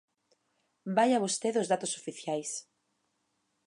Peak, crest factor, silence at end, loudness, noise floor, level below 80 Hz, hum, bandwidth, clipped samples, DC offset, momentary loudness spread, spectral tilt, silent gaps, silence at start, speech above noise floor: -14 dBFS; 20 dB; 1.05 s; -31 LUFS; -78 dBFS; -88 dBFS; none; 11.5 kHz; under 0.1%; under 0.1%; 12 LU; -3.5 dB/octave; none; 0.85 s; 48 dB